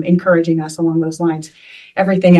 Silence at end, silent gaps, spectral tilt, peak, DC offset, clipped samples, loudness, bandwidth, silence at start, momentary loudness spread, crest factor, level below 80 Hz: 0 s; none; -7.5 dB/octave; 0 dBFS; under 0.1%; under 0.1%; -16 LUFS; 11.5 kHz; 0 s; 12 LU; 14 dB; -58 dBFS